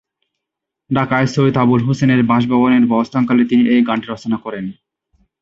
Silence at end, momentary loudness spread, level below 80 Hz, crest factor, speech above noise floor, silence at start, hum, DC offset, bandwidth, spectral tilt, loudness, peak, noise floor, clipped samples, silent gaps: 0.7 s; 9 LU; -52 dBFS; 14 dB; 67 dB; 0.9 s; none; under 0.1%; 7.6 kHz; -7.5 dB/octave; -15 LUFS; 0 dBFS; -81 dBFS; under 0.1%; none